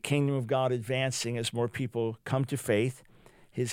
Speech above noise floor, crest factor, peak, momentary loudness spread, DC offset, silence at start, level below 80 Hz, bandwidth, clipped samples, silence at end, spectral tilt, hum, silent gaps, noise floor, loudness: 22 dB; 18 dB; -12 dBFS; 6 LU; under 0.1%; 0.05 s; -66 dBFS; 16.5 kHz; under 0.1%; 0 s; -5.5 dB/octave; none; none; -52 dBFS; -30 LUFS